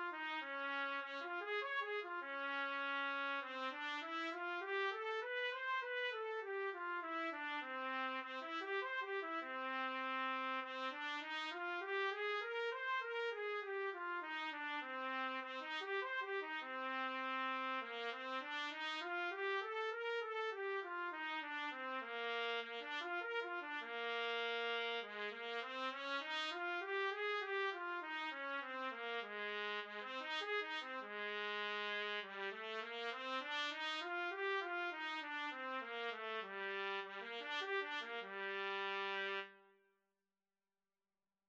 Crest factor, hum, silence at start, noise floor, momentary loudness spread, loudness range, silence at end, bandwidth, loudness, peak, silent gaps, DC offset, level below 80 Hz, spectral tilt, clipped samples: 16 dB; none; 0 s; under -90 dBFS; 4 LU; 2 LU; 1.85 s; 8.4 kHz; -43 LUFS; -28 dBFS; none; under 0.1%; under -90 dBFS; -2 dB/octave; under 0.1%